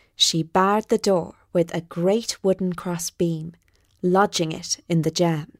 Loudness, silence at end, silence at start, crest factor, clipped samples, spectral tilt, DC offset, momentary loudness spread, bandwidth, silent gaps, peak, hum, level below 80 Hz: -22 LUFS; 0.15 s; 0.2 s; 18 dB; under 0.1%; -4.5 dB/octave; under 0.1%; 8 LU; 16 kHz; none; -6 dBFS; none; -58 dBFS